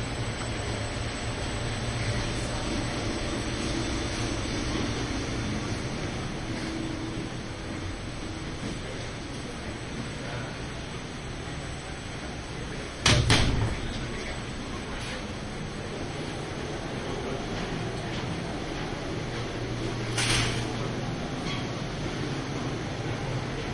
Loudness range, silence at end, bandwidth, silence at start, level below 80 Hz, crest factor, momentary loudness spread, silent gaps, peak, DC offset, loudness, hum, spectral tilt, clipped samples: 8 LU; 0 s; 11.5 kHz; 0 s; -40 dBFS; 24 dB; 8 LU; none; -6 dBFS; under 0.1%; -31 LUFS; none; -4.5 dB/octave; under 0.1%